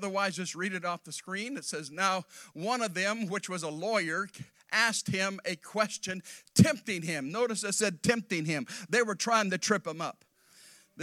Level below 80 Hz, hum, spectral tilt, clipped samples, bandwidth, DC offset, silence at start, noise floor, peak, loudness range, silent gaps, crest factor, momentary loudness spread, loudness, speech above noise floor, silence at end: -66 dBFS; none; -4 dB/octave; under 0.1%; 16 kHz; under 0.1%; 0 s; -59 dBFS; -8 dBFS; 3 LU; none; 24 dB; 10 LU; -31 LUFS; 27 dB; 0 s